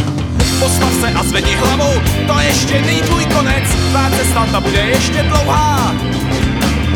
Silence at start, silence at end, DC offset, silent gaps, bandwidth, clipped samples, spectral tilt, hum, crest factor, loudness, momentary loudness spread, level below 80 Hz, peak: 0 s; 0 s; under 0.1%; none; 18 kHz; under 0.1%; -4.5 dB/octave; none; 12 dB; -13 LUFS; 3 LU; -22 dBFS; 0 dBFS